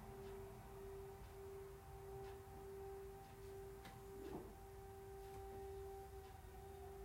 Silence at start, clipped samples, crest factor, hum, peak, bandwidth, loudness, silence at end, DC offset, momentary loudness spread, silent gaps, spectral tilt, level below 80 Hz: 0 s; under 0.1%; 16 dB; none; -40 dBFS; 16 kHz; -56 LUFS; 0 s; under 0.1%; 4 LU; none; -6 dB/octave; -62 dBFS